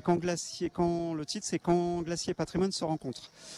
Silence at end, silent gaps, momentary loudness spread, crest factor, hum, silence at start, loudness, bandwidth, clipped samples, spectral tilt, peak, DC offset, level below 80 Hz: 0 s; none; 6 LU; 18 dB; none; 0.05 s; -32 LUFS; 12.5 kHz; under 0.1%; -5 dB/octave; -14 dBFS; under 0.1%; -58 dBFS